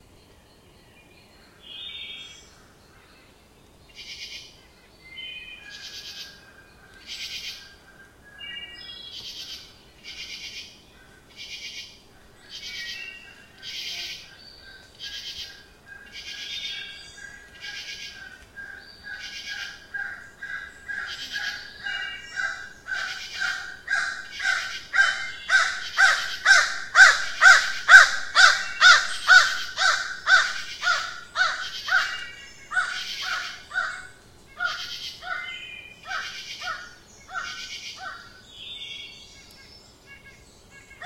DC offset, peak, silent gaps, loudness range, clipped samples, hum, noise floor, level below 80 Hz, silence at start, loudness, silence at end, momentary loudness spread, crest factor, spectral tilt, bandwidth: under 0.1%; 0 dBFS; none; 24 LU; under 0.1%; none; -54 dBFS; -60 dBFS; 1.65 s; -21 LUFS; 0 s; 25 LU; 26 dB; 1.5 dB/octave; 16.5 kHz